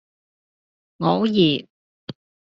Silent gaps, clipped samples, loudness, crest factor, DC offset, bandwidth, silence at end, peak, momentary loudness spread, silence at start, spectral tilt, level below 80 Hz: 1.70-2.07 s; under 0.1%; -20 LUFS; 20 dB; under 0.1%; 7.4 kHz; 0.4 s; -4 dBFS; 22 LU; 1 s; -5 dB/octave; -64 dBFS